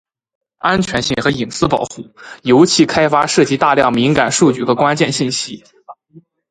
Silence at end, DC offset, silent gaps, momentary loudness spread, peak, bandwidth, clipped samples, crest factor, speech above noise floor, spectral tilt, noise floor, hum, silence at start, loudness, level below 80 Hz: 0.3 s; under 0.1%; none; 12 LU; 0 dBFS; 10.5 kHz; under 0.1%; 14 dB; 32 dB; -4.5 dB/octave; -46 dBFS; none; 0.65 s; -14 LUFS; -46 dBFS